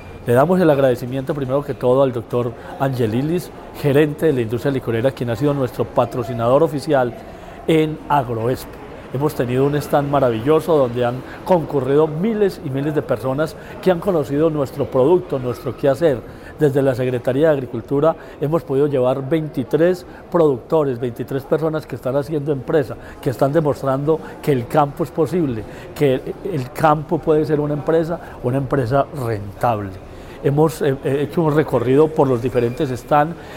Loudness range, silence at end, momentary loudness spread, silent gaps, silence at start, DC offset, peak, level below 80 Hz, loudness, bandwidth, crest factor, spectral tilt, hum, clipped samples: 2 LU; 0 s; 9 LU; none; 0 s; under 0.1%; 0 dBFS; -44 dBFS; -19 LUFS; 16.5 kHz; 18 dB; -7.5 dB/octave; none; under 0.1%